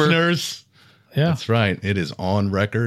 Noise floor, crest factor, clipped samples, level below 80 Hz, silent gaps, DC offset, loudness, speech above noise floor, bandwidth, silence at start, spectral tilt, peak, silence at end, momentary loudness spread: -53 dBFS; 16 dB; under 0.1%; -58 dBFS; none; under 0.1%; -21 LUFS; 33 dB; 14.5 kHz; 0 s; -6 dB/octave; -4 dBFS; 0 s; 9 LU